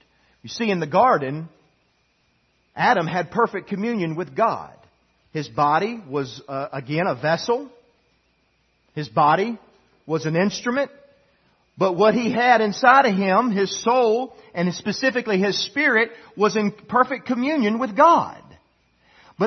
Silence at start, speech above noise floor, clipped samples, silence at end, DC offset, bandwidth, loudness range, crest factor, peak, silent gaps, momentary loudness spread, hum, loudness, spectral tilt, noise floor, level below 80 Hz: 0.45 s; 45 dB; under 0.1%; 0 s; under 0.1%; 6.4 kHz; 6 LU; 20 dB; -2 dBFS; none; 14 LU; none; -21 LUFS; -5 dB/octave; -65 dBFS; -66 dBFS